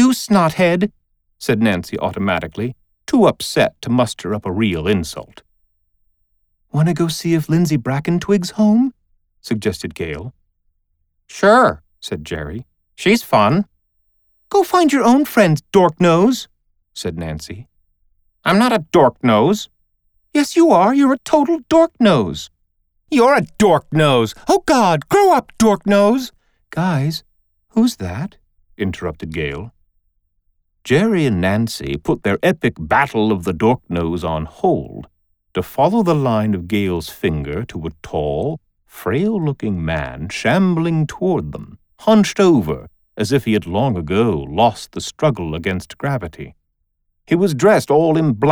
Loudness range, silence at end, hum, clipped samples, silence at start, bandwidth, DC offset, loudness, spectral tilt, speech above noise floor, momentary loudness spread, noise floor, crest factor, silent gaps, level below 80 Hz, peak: 6 LU; 0 s; none; under 0.1%; 0 s; over 20 kHz; under 0.1%; -17 LUFS; -6 dB/octave; 53 dB; 14 LU; -69 dBFS; 16 dB; none; -44 dBFS; -2 dBFS